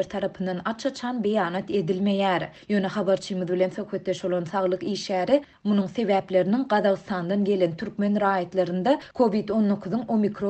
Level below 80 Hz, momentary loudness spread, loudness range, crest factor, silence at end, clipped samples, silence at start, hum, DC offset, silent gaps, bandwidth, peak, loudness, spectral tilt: -62 dBFS; 6 LU; 2 LU; 16 dB; 0 s; under 0.1%; 0 s; none; under 0.1%; none; 8.6 kHz; -8 dBFS; -25 LUFS; -6.5 dB/octave